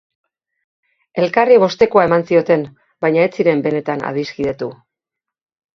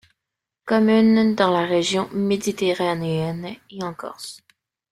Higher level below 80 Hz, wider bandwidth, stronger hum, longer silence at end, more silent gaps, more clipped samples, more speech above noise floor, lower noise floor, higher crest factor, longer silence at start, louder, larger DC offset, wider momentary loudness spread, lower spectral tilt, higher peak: first, -56 dBFS vs -62 dBFS; second, 6.4 kHz vs 13.5 kHz; neither; first, 1 s vs 0.55 s; neither; neither; first, 69 dB vs 64 dB; about the same, -84 dBFS vs -84 dBFS; about the same, 16 dB vs 18 dB; first, 1.15 s vs 0.65 s; first, -15 LUFS vs -20 LUFS; neither; second, 12 LU vs 18 LU; first, -7 dB/octave vs -5.5 dB/octave; first, 0 dBFS vs -4 dBFS